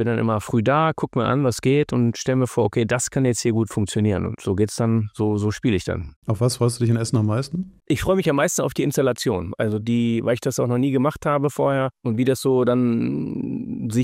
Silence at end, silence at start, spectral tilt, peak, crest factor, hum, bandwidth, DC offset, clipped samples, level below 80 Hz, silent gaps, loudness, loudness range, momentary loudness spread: 0 s; 0 s; -6 dB/octave; -8 dBFS; 14 dB; none; 16 kHz; under 0.1%; under 0.1%; -48 dBFS; 6.16-6.22 s; -21 LUFS; 2 LU; 6 LU